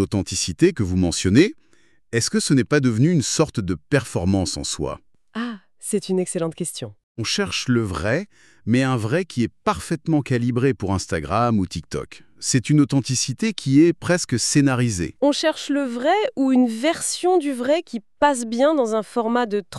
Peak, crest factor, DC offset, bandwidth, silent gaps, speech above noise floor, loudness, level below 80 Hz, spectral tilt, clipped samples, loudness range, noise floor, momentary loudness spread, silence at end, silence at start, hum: -4 dBFS; 18 dB; 0.2%; 13 kHz; 7.03-7.15 s; 24 dB; -21 LUFS; -48 dBFS; -5 dB/octave; under 0.1%; 5 LU; -45 dBFS; 11 LU; 0 s; 0 s; none